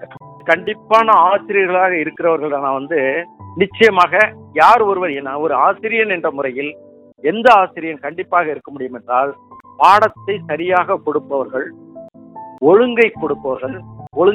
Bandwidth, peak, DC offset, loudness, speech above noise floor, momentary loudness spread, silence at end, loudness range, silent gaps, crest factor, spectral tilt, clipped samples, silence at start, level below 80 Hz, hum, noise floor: 12.5 kHz; 0 dBFS; under 0.1%; -15 LUFS; 22 dB; 14 LU; 0 s; 3 LU; none; 16 dB; -5.5 dB/octave; 0.3%; 0 s; -60 dBFS; none; -37 dBFS